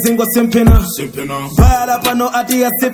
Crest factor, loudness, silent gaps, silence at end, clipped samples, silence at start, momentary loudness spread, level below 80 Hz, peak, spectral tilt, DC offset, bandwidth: 12 dB; -13 LUFS; none; 0 s; under 0.1%; 0 s; 10 LU; -18 dBFS; 0 dBFS; -5.5 dB/octave; under 0.1%; 16 kHz